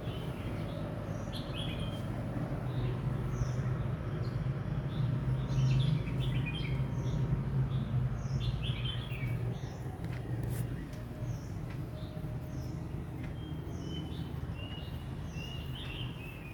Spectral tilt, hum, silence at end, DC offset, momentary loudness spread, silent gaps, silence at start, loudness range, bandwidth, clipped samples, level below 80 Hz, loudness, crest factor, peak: -7 dB/octave; none; 0 s; under 0.1%; 8 LU; none; 0 s; 8 LU; 19.5 kHz; under 0.1%; -46 dBFS; -37 LUFS; 16 dB; -20 dBFS